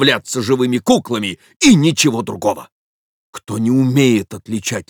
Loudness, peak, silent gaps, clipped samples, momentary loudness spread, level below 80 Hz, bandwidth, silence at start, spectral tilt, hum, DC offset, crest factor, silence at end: -15 LUFS; 0 dBFS; 1.56-1.60 s, 2.72-3.33 s; under 0.1%; 13 LU; -54 dBFS; over 20 kHz; 0 s; -4.5 dB/octave; none; under 0.1%; 16 dB; 0.1 s